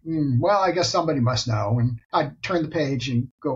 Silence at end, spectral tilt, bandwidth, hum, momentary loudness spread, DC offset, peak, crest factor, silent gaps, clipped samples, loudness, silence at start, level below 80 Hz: 0 s; -6 dB/octave; 7.8 kHz; none; 5 LU; under 0.1%; -8 dBFS; 16 dB; 2.05-2.09 s, 3.31-3.38 s; under 0.1%; -23 LUFS; 0.05 s; -50 dBFS